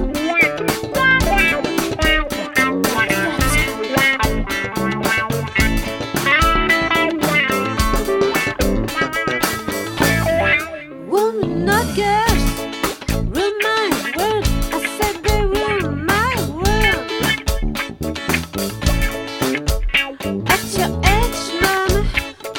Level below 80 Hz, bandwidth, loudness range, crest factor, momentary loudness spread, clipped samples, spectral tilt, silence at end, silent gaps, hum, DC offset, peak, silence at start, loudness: -26 dBFS; 17.5 kHz; 3 LU; 18 dB; 7 LU; under 0.1%; -4 dB/octave; 0 s; none; none; under 0.1%; 0 dBFS; 0 s; -17 LUFS